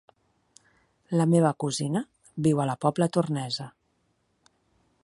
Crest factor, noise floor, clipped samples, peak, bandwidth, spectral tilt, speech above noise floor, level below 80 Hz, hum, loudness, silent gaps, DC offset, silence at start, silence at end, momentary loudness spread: 20 dB; -72 dBFS; under 0.1%; -8 dBFS; 11.5 kHz; -6.5 dB/octave; 47 dB; -70 dBFS; none; -26 LUFS; none; under 0.1%; 1.1 s; 1.35 s; 11 LU